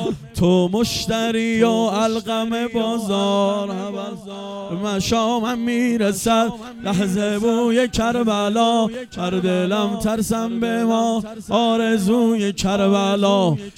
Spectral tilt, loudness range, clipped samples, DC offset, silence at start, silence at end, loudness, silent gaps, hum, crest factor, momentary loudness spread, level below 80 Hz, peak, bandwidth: -5 dB/octave; 3 LU; under 0.1%; under 0.1%; 0 s; 0.05 s; -19 LUFS; none; none; 16 dB; 8 LU; -46 dBFS; -4 dBFS; 16 kHz